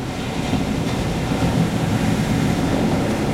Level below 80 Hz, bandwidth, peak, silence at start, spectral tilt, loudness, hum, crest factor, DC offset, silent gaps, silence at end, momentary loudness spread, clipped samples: -34 dBFS; 16 kHz; -6 dBFS; 0 s; -6 dB/octave; -20 LUFS; none; 14 dB; under 0.1%; none; 0 s; 3 LU; under 0.1%